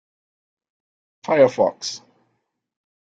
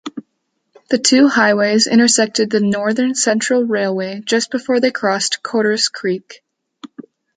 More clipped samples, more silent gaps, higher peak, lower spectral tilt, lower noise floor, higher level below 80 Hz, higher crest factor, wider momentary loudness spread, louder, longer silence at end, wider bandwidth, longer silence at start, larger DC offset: neither; neither; about the same, -2 dBFS vs -2 dBFS; first, -4.5 dB/octave vs -3 dB/octave; about the same, -73 dBFS vs -70 dBFS; about the same, -68 dBFS vs -64 dBFS; first, 22 dB vs 16 dB; first, 20 LU vs 10 LU; second, -19 LUFS vs -15 LUFS; first, 1.15 s vs 0.35 s; second, 7.8 kHz vs 9.6 kHz; first, 1.25 s vs 0.05 s; neither